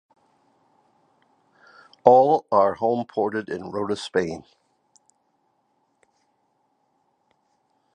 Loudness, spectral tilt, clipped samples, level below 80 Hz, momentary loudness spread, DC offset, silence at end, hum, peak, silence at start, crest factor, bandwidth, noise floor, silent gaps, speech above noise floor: -21 LUFS; -6 dB/octave; under 0.1%; -64 dBFS; 14 LU; under 0.1%; 3.55 s; none; 0 dBFS; 2.05 s; 26 dB; 10 kHz; -70 dBFS; none; 49 dB